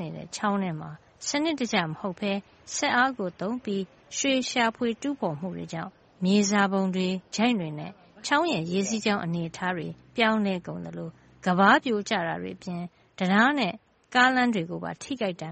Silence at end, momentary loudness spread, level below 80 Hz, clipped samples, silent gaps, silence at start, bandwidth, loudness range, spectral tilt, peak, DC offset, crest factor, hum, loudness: 0 s; 14 LU; -66 dBFS; under 0.1%; none; 0 s; 8.4 kHz; 3 LU; -4.5 dB/octave; -4 dBFS; under 0.1%; 22 dB; none; -26 LUFS